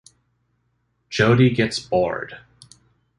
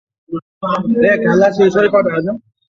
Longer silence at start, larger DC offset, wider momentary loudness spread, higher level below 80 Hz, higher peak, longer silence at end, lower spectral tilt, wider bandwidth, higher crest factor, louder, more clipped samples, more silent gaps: first, 1.1 s vs 0.3 s; neither; about the same, 15 LU vs 16 LU; about the same, -52 dBFS vs -52 dBFS; about the same, -2 dBFS vs 0 dBFS; first, 0.8 s vs 0.3 s; about the same, -6 dB/octave vs -7 dB/octave; first, 11 kHz vs 7.2 kHz; first, 20 dB vs 14 dB; second, -20 LUFS vs -14 LUFS; neither; second, none vs 0.42-0.61 s